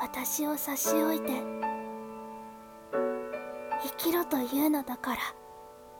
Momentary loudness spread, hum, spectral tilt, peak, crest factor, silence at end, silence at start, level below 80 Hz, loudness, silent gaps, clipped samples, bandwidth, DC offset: 17 LU; none; -3 dB/octave; -16 dBFS; 16 dB; 0 s; 0 s; -66 dBFS; -31 LUFS; none; under 0.1%; 18 kHz; under 0.1%